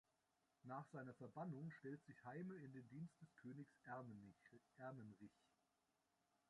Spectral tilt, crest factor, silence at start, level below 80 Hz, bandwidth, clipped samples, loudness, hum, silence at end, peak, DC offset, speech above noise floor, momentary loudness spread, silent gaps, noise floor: -8.5 dB/octave; 18 dB; 0.65 s; under -90 dBFS; 11 kHz; under 0.1%; -58 LUFS; none; 1.2 s; -40 dBFS; under 0.1%; 31 dB; 9 LU; none; -88 dBFS